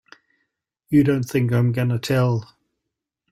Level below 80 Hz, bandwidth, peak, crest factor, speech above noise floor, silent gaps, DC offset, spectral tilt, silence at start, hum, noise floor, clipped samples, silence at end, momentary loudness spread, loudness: -56 dBFS; 15.5 kHz; -6 dBFS; 16 dB; 63 dB; none; under 0.1%; -7.5 dB/octave; 0.9 s; none; -82 dBFS; under 0.1%; 0.85 s; 5 LU; -20 LUFS